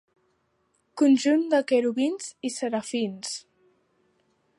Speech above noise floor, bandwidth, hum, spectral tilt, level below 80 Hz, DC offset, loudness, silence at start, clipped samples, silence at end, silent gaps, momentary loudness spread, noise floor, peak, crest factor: 47 dB; 11.5 kHz; none; -4 dB/octave; -80 dBFS; under 0.1%; -25 LUFS; 0.95 s; under 0.1%; 1.2 s; none; 13 LU; -71 dBFS; -10 dBFS; 16 dB